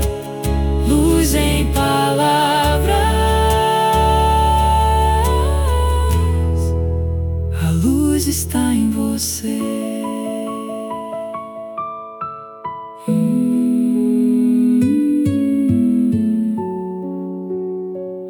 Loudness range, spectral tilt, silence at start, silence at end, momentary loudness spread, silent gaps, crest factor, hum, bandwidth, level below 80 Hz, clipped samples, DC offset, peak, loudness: 8 LU; -5.5 dB/octave; 0 s; 0 s; 12 LU; none; 14 dB; none; 17.5 kHz; -24 dBFS; under 0.1%; under 0.1%; -4 dBFS; -17 LUFS